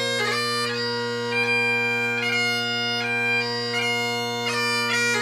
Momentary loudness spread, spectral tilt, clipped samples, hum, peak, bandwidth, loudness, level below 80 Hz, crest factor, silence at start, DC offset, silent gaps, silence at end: 4 LU; -2.5 dB/octave; under 0.1%; none; -12 dBFS; 15.5 kHz; -22 LUFS; -72 dBFS; 12 dB; 0 s; under 0.1%; none; 0 s